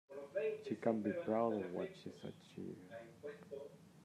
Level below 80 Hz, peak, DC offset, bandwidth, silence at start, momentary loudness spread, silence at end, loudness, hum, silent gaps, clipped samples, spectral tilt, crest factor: -86 dBFS; -22 dBFS; under 0.1%; 13.5 kHz; 0.1 s; 16 LU; 0 s; -43 LUFS; none; none; under 0.1%; -7.5 dB/octave; 20 dB